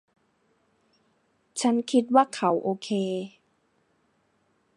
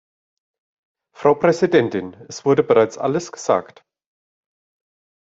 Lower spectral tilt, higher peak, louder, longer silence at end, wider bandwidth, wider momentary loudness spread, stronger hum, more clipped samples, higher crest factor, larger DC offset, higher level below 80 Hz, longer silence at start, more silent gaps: about the same, -5 dB/octave vs -6 dB/octave; second, -6 dBFS vs -2 dBFS; second, -25 LUFS vs -18 LUFS; second, 1.5 s vs 1.65 s; first, 11.5 kHz vs 7.8 kHz; first, 13 LU vs 9 LU; neither; neither; first, 24 dB vs 18 dB; neither; second, -82 dBFS vs -64 dBFS; first, 1.55 s vs 1.2 s; neither